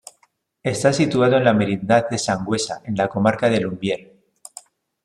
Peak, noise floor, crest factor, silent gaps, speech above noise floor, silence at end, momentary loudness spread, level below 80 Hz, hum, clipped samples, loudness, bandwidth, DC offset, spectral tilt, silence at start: -2 dBFS; -63 dBFS; 18 dB; none; 44 dB; 1 s; 12 LU; -56 dBFS; none; under 0.1%; -20 LUFS; 13.5 kHz; under 0.1%; -5.5 dB/octave; 0.65 s